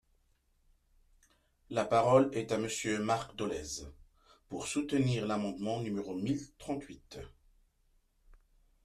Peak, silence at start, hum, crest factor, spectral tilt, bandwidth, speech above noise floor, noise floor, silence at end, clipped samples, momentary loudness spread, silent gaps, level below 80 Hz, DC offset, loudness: -12 dBFS; 1.7 s; none; 22 dB; -5.5 dB/octave; 14 kHz; 39 dB; -72 dBFS; 1.55 s; under 0.1%; 20 LU; none; -62 dBFS; under 0.1%; -33 LUFS